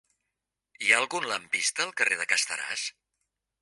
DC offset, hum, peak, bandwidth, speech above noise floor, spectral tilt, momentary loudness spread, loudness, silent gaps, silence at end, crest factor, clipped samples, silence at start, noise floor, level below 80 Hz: under 0.1%; none; -6 dBFS; 11.5 kHz; 57 dB; 0.5 dB/octave; 9 LU; -26 LUFS; none; 0.7 s; 24 dB; under 0.1%; 0.8 s; -86 dBFS; -82 dBFS